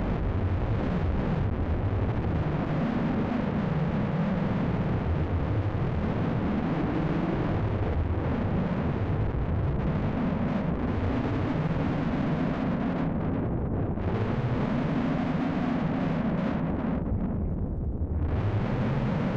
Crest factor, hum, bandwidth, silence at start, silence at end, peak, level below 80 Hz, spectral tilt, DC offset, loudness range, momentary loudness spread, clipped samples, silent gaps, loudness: 8 dB; none; 6.8 kHz; 0 s; 0 s; -20 dBFS; -36 dBFS; -9.5 dB/octave; under 0.1%; 1 LU; 2 LU; under 0.1%; none; -28 LUFS